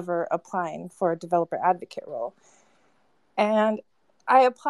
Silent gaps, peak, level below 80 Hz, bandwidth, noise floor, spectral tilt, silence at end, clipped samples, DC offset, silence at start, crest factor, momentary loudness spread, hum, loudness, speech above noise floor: none; -6 dBFS; -82 dBFS; 11.5 kHz; -67 dBFS; -6 dB/octave; 0 s; under 0.1%; under 0.1%; 0 s; 20 dB; 14 LU; none; -26 LUFS; 43 dB